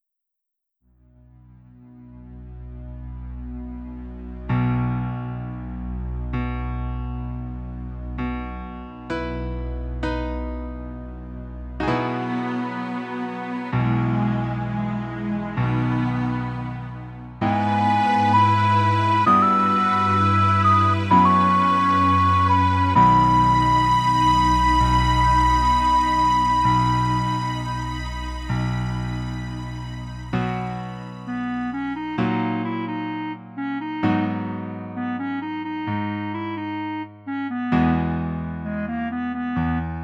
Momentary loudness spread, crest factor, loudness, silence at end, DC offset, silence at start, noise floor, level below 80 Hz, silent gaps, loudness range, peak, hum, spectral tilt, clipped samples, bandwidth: 17 LU; 18 dB; -22 LUFS; 0 s; under 0.1%; 1.8 s; -81 dBFS; -34 dBFS; none; 13 LU; -4 dBFS; none; -6.5 dB/octave; under 0.1%; 11.5 kHz